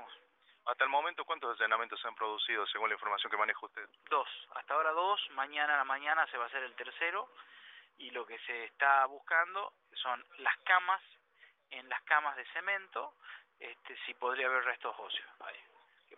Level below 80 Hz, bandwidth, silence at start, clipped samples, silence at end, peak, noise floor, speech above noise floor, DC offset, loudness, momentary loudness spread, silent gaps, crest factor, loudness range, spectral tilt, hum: under -90 dBFS; 4 kHz; 0 s; under 0.1%; 0 s; -12 dBFS; -67 dBFS; 32 dB; under 0.1%; -34 LUFS; 18 LU; none; 24 dB; 5 LU; 4.5 dB/octave; none